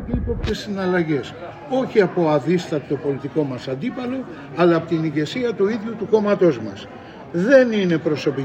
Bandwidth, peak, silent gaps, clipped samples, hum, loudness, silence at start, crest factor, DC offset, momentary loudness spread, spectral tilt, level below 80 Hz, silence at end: 8.6 kHz; -2 dBFS; none; under 0.1%; none; -20 LUFS; 0 s; 18 dB; under 0.1%; 12 LU; -7 dB/octave; -40 dBFS; 0 s